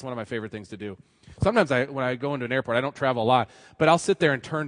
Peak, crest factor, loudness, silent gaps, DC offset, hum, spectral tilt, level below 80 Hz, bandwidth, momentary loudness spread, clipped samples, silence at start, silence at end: -4 dBFS; 20 dB; -24 LUFS; none; under 0.1%; none; -5.5 dB/octave; -54 dBFS; 10.5 kHz; 15 LU; under 0.1%; 0 s; 0 s